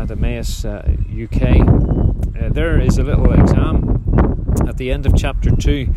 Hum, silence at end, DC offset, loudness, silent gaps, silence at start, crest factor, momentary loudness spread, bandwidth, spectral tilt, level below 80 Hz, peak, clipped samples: none; 0 s; under 0.1%; -16 LUFS; none; 0 s; 14 dB; 9 LU; 12.5 kHz; -7.5 dB/octave; -16 dBFS; 0 dBFS; under 0.1%